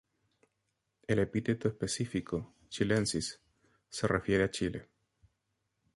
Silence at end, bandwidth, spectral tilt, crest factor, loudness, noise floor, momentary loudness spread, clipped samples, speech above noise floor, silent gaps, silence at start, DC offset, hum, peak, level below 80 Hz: 1.1 s; 11.5 kHz; -5 dB/octave; 20 dB; -33 LUFS; -82 dBFS; 15 LU; under 0.1%; 50 dB; none; 1.1 s; under 0.1%; none; -14 dBFS; -56 dBFS